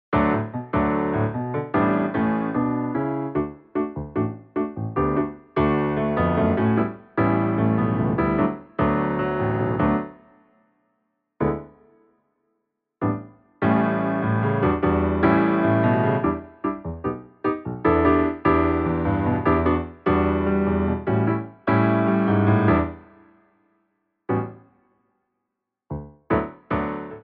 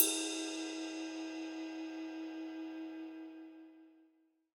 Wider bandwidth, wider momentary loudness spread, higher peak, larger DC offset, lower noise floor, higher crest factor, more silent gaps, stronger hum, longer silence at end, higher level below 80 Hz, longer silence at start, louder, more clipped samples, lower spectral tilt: second, 4.8 kHz vs over 20 kHz; second, 9 LU vs 16 LU; about the same, -6 dBFS vs -8 dBFS; neither; first, -82 dBFS vs -72 dBFS; second, 18 dB vs 34 dB; neither; neither; second, 0.05 s vs 0.5 s; first, -40 dBFS vs under -90 dBFS; about the same, 0.1 s vs 0 s; first, -23 LUFS vs -41 LUFS; neither; first, -11.5 dB/octave vs 0 dB/octave